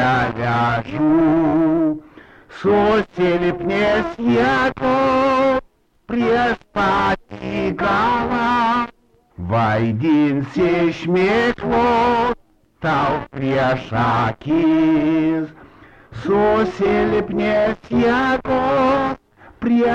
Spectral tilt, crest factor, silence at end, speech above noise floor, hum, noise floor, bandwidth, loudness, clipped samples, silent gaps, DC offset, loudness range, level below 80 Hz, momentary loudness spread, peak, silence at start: -7.5 dB/octave; 10 dB; 0 s; 32 dB; none; -49 dBFS; 8.4 kHz; -18 LUFS; under 0.1%; none; under 0.1%; 2 LU; -42 dBFS; 7 LU; -8 dBFS; 0 s